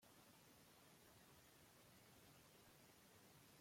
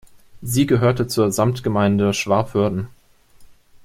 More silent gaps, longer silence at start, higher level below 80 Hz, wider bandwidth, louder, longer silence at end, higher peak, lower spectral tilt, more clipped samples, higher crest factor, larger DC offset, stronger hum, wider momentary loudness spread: neither; second, 0 s vs 0.35 s; second, -88 dBFS vs -50 dBFS; about the same, 16.5 kHz vs 16.5 kHz; second, -68 LUFS vs -19 LUFS; second, 0 s vs 0.4 s; second, -56 dBFS vs -2 dBFS; second, -3 dB/octave vs -6 dB/octave; neither; about the same, 14 dB vs 18 dB; neither; neither; second, 1 LU vs 8 LU